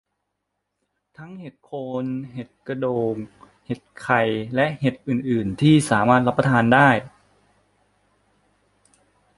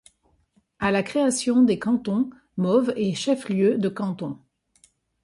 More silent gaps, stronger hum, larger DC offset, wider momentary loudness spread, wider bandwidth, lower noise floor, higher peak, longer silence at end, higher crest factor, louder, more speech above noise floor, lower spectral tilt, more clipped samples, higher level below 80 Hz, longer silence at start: neither; first, 50 Hz at -55 dBFS vs none; neither; first, 20 LU vs 10 LU; about the same, 11.5 kHz vs 11.5 kHz; first, -78 dBFS vs -65 dBFS; first, -2 dBFS vs -8 dBFS; first, 2.3 s vs 0.85 s; first, 22 dB vs 16 dB; first, -20 LUFS vs -23 LUFS; first, 57 dB vs 43 dB; about the same, -6.5 dB/octave vs -5.5 dB/octave; neither; about the same, -56 dBFS vs -60 dBFS; first, 1.2 s vs 0.8 s